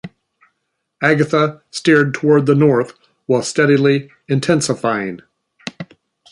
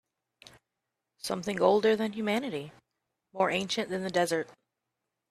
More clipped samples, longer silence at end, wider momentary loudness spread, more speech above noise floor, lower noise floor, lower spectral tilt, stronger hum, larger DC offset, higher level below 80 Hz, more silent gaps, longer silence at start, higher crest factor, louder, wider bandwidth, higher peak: neither; second, 0.45 s vs 0.8 s; first, 19 LU vs 16 LU; about the same, 58 dB vs 57 dB; second, -73 dBFS vs -86 dBFS; about the same, -5.5 dB/octave vs -4.5 dB/octave; neither; neither; first, -60 dBFS vs -72 dBFS; neither; second, 0.05 s vs 1.25 s; second, 16 dB vs 22 dB; first, -15 LUFS vs -29 LUFS; second, 11.5 kHz vs 14 kHz; first, -2 dBFS vs -8 dBFS